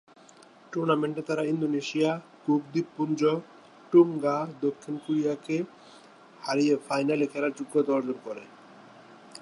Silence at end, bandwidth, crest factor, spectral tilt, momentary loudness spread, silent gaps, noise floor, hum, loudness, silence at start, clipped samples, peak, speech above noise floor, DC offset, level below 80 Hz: 0 s; 11.5 kHz; 20 dB; -6.5 dB/octave; 12 LU; none; -54 dBFS; none; -28 LUFS; 0.7 s; under 0.1%; -8 dBFS; 27 dB; under 0.1%; -82 dBFS